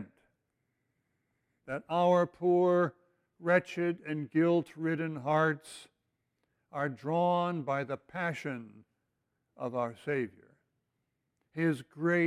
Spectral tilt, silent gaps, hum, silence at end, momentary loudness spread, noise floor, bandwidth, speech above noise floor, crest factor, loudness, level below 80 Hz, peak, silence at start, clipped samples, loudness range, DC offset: -7.5 dB/octave; none; none; 0 s; 14 LU; -82 dBFS; 12 kHz; 52 dB; 20 dB; -32 LUFS; -78 dBFS; -14 dBFS; 0 s; under 0.1%; 8 LU; under 0.1%